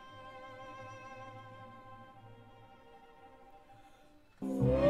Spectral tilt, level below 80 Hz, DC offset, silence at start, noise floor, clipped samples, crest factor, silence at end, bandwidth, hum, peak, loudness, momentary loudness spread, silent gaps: -8.5 dB/octave; -54 dBFS; under 0.1%; 0 s; -62 dBFS; under 0.1%; 22 dB; 0 s; 12.5 kHz; none; -18 dBFS; -42 LUFS; 19 LU; none